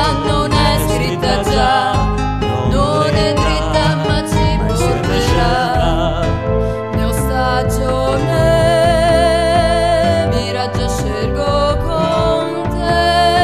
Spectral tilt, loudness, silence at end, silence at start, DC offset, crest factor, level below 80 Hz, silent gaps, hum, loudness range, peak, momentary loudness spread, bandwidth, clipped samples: -5.5 dB/octave; -15 LUFS; 0 s; 0 s; 0.7%; 12 dB; -22 dBFS; none; none; 2 LU; -2 dBFS; 6 LU; 14 kHz; under 0.1%